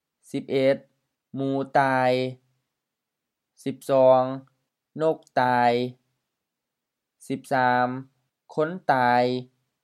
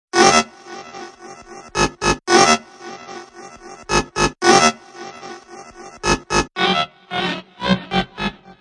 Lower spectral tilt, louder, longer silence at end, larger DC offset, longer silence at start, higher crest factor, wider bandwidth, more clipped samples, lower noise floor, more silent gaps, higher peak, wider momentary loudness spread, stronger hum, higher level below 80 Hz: first, -6.5 dB/octave vs -3 dB/octave; second, -24 LUFS vs -17 LUFS; about the same, 0.4 s vs 0.3 s; neither; first, 0.35 s vs 0.15 s; about the same, 20 dB vs 20 dB; first, 13.5 kHz vs 11.5 kHz; neither; first, -85 dBFS vs -39 dBFS; neither; second, -6 dBFS vs 0 dBFS; second, 15 LU vs 25 LU; neither; second, -74 dBFS vs -40 dBFS